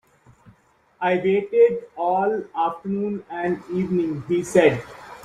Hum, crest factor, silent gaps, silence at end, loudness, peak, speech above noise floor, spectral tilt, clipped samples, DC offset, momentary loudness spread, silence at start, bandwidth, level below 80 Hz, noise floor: none; 20 dB; none; 0 s; -22 LUFS; -2 dBFS; 38 dB; -6.5 dB/octave; under 0.1%; under 0.1%; 9 LU; 1 s; 13 kHz; -60 dBFS; -59 dBFS